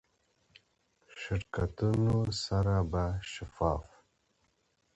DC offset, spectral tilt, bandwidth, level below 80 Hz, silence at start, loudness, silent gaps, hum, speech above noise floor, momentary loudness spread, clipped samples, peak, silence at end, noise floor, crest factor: under 0.1%; -6.5 dB/octave; 8.2 kHz; -46 dBFS; 1.1 s; -32 LUFS; none; none; 44 dB; 10 LU; under 0.1%; -14 dBFS; 1.1 s; -75 dBFS; 18 dB